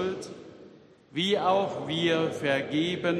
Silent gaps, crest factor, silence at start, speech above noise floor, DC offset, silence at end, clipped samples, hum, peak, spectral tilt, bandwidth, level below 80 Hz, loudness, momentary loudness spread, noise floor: none; 18 dB; 0 s; 26 dB; under 0.1%; 0 s; under 0.1%; none; -12 dBFS; -5 dB/octave; 13 kHz; -68 dBFS; -27 LUFS; 13 LU; -53 dBFS